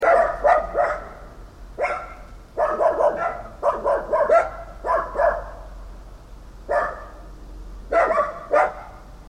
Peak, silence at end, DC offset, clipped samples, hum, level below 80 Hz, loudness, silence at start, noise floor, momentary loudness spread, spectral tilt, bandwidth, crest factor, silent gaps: -6 dBFS; 0 s; under 0.1%; under 0.1%; none; -40 dBFS; -22 LUFS; 0 s; -41 dBFS; 24 LU; -5.5 dB/octave; 10.5 kHz; 18 dB; none